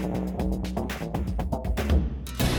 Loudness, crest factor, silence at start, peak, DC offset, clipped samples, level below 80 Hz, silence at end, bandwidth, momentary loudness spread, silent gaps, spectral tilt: -29 LUFS; 14 dB; 0 s; -12 dBFS; under 0.1%; under 0.1%; -30 dBFS; 0 s; 19.5 kHz; 5 LU; none; -6 dB/octave